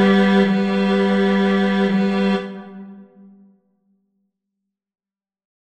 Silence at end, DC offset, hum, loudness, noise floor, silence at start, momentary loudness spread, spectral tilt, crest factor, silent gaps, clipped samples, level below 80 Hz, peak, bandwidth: 2.6 s; under 0.1%; none; -17 LUFS; -80 dBFS; 0 s; 18 LU; -7.5 dB/octave; 16 dB; none; under 0.1%; -64 dBFS; -4 dBFS; 8.6 kHz